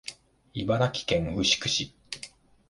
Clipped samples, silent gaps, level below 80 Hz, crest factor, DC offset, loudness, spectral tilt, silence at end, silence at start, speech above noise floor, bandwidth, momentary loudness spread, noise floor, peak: under 0.1%; none; -50 dBFS; 20 dB; under 0.1%; -27 LUFS; -3.5 dB/octave; 0.45 s; 0.05 s; 22 dB; 11.5 kHz; 16 LU; -49 dBFS; -8 dBFS